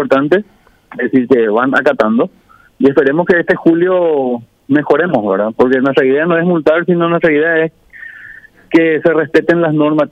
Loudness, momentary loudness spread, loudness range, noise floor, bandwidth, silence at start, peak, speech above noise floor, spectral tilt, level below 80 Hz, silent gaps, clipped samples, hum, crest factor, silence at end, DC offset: -12 LUFS; 9 LU; 1 LU; -37 dBFS; 7.8 kHz; 0 s; 0 dBFS; 25 dB; -8 dB/octave; -54 dBFS; none; under 0.1%; none; 12 dB; 0.05 s; under 0.1%